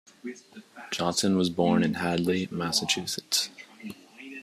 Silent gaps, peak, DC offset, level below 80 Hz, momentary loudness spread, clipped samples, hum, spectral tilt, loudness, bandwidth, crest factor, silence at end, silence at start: none; -10 dBFS; under 0.1%; -66 dBFS; 19 LU; under 0.1%; none; -4 dB/octave; -26 LUFS; 14.5 kHz; 18 dB; 0 s; 0.25 s